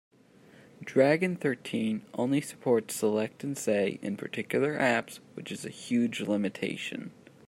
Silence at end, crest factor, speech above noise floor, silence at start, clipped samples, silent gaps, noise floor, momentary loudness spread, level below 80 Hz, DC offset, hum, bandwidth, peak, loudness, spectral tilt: 0.35 s; 20 dB; 28 dB; 0.8 s; under 0.1%; none; -57 dBFS; 13 LU; -76 dBFS; under 0.1%; none; 16 kHz; -10 dBFS; -30 LUFS; -5 dB/octave